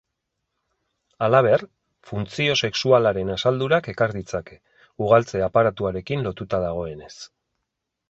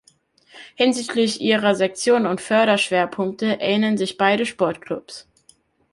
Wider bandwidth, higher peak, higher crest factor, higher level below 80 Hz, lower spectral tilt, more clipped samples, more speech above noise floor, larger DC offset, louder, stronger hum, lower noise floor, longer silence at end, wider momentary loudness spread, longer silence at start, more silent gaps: second, 8 kHz vs 11.5 kHz; about the same, -2 dBFS vs -4 dBFS; about the same, 20 dB vs 18 dB; first, -50 dBFS vs -64 dBFS; first, -5.5 dB/octave vs -4 dB/octave; neither; first, 59 dB vs 38 dB; neither; about the same, -22 LUFS vs -20 LUFS; neither; first, -81 dBFS vs -58 dBFS; first, 0.85 s vs 0.7 s; first, 14 LU vs 9 LU; first, 1.2 s vs 0.55 s; neither